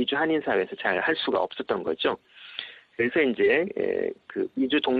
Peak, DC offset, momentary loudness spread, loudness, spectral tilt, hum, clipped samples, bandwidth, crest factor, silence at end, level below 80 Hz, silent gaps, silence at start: -10 dBFS; under 0.1%; 14 LU; -26 LUFS; -7 dB/octave; none; under 0.1%; 4.9 kHz; 16 dB; 0 s; -66 dBFS; none; 0 s